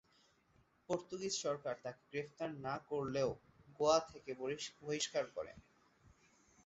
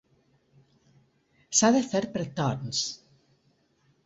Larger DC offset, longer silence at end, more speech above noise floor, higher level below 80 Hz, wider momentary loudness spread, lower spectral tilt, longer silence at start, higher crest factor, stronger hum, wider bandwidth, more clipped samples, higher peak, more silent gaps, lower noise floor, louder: neither; about the same, 1.05 s vs 1.1 s; second, 33 dB vs 42 dB; second, -72 dBFS vs -66 dBFS; about the same, 12 LU vs 12 LU; about the same, -3.5 dB/octave vs -3.5 dB/octave; second, 0.9 s vs 1.5 s; about the same, 22 dB vs 22 dB; neither; about the same, 8 kHz vs 8.2 kHz; neither; second, -20 dBFS vs -8 dBFS; neither; first, -73 dBFS vs -68 dBFS; second, -41 LUFS vs -26 LUFS